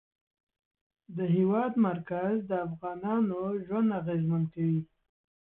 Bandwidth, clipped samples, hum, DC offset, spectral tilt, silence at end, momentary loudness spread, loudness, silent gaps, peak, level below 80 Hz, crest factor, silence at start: 3.8 kHz; under 0.1%; none; under 0.1%; -12.5 dB/octave; 0.65 s; 8 LU; -30 LUFS; none; -16 dBFS; -68 dBFS; 16 dB; 1.1 s